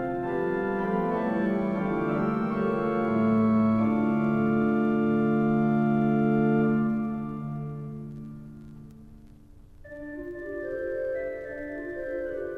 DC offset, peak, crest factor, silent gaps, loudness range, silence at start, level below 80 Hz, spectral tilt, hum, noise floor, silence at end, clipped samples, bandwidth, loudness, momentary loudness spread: under 0.1%; -14 dBFS; 14 dB; none; 14 LU; 0 s; -54 dBFS; -10 dB/octave; none; -50 dBFS; 0 s; under 0.1%; 4.7 kHz; -26 LUFS; 16 LU